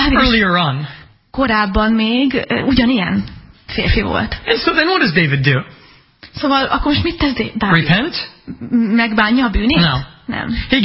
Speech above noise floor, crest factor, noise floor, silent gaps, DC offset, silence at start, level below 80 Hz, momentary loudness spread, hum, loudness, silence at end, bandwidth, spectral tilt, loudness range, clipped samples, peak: 28 dB; 16 dB; -43 dBFS; none; under 0.1%; 0 s; -30 dBFS; 12 LU; none; -15 LUFS; 0 s; 5.8 kHz; -9.5 dB/octave; 1 LU; under 0.1%; 0 dBFS